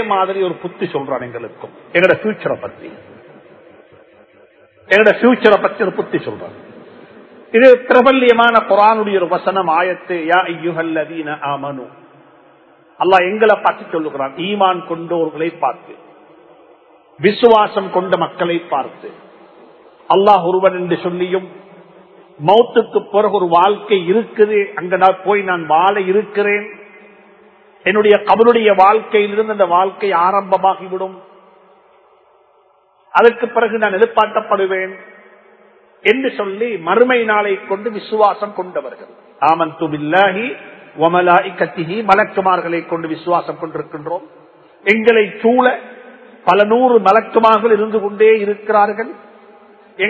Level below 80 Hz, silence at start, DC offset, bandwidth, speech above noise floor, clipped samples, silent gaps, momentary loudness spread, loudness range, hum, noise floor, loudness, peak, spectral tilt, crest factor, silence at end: -62 dBFS; 0 s; under 0.1%; 8 kHz; 40 dB; 0.1%; none; 13 LU; 6 LU; none; -53 dBFS; -14 LUFS; 0 dBFS; -7 dB/octave; 16 dB; 0 s